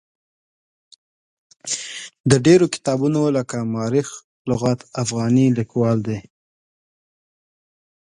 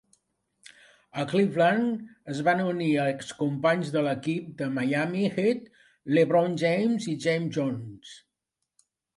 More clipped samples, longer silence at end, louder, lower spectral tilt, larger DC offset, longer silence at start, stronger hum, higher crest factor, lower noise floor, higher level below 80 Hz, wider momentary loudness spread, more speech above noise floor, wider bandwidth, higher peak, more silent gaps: neither; first, 1.9 s vs 1 s; first, -19 LUFS vs -26 LUFS; about the same, -6 dB/octave vs -6.5 dB/octave; neither; first, 1.65 s vs 1.15 s; neither; about the same, 20 dB vs 16 dB; first, under -90 dBFS vs -84 dBFS; first, -54 dBFS vs -72 dBFS; about the same, 14 LU vs 13 LU; first, over 72 dB vs 58 dB; about the same, 11.5 kHz vs 11.5 kHz; first, 0 dBFS vs -10 dBFS; first, 2.20-2.24 s, 4.24-4.45 s vs none